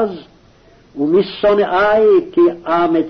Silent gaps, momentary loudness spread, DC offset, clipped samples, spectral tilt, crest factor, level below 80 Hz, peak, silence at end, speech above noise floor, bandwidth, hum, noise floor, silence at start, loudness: none; 10 LU; under 0.1%; under 0.1%; -7.5 dB/octave; 10 dB; -48 dBFS; -4 dBFS; 0 s; 34 dB; 6 kHz; none; -47 dBFS; 0 s; -14 LUFS